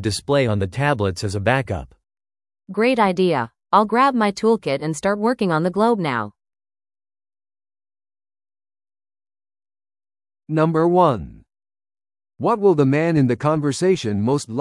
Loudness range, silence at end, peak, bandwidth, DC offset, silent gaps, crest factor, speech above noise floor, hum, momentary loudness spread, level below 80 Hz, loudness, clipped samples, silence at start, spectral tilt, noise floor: 6 LU; 0 s; -2 dBFS; 12 kHz; under 0.1%; none; 18 dB; over 72 dB; none; 8 LU; -52 dBFS; -19 LUFS; under 0.1%; 0 s; -6.5 dB/octave; under -90 dBFS